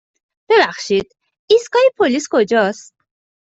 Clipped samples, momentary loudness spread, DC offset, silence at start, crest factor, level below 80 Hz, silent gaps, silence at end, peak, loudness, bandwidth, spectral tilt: under 0.1%; 6 LU; under 0.1%; 0.5 s; 14 dB; -62 dBFS; 1.39-1.48 s; 0.65 s; -2 dBFS; -15 LUFS; 8.2 kHz; -3.5 dB/octave